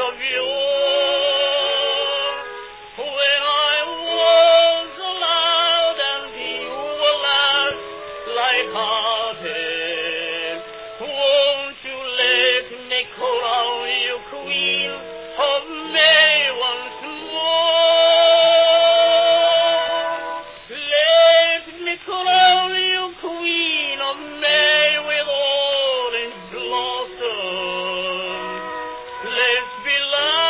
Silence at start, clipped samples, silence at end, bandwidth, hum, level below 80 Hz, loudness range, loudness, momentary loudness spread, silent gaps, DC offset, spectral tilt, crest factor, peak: 0 s; under 0.1%; 0 s; 4 kHz; none; -60 dBFS; 7 LU; -17 LUFS; 15 LU; none; under 0.1%; -5 dB/octave; 16 dB; -2 dBFS